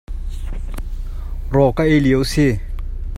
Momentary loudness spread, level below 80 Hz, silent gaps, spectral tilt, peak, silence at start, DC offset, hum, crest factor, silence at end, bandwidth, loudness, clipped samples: 17 LU; -24 dBFS; none; -6.5 dB/octave; 0 dBFS; 0.1 s; under 0.1%; none; 18 dB; 0 s; 14 kHz; -16 LUFS; under 0.1%